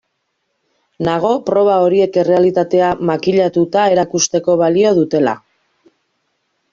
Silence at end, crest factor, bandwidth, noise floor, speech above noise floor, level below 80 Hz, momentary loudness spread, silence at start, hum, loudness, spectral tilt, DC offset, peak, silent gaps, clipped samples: 1.35 s; 12 dB; 7.4 kHz; -69 dBFS; 56 dB; -56 dBFS; 5 LU; 1 s; none; -14 LUFS; -5 dB/octave; under 0.1%; -2 dBFS; none; under 0.1%